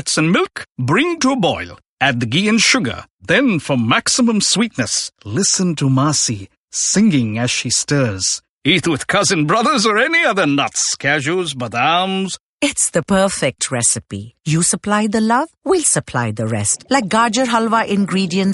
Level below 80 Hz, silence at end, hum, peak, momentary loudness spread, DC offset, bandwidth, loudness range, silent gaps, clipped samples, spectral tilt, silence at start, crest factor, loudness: -52 dBFS; 0 s; none; 0 dBFS; 7 LU; under 0.1%; 11.5 kHz; 2 LU; 1.86-1.97 s, 3.10-3.19 s, 6.57-6.68 s, 8.49-8.61 s, 12.40-12.59 s; under 0.1%; -3.5 dB/octave; 0 s; 16 dB; -16 LUFS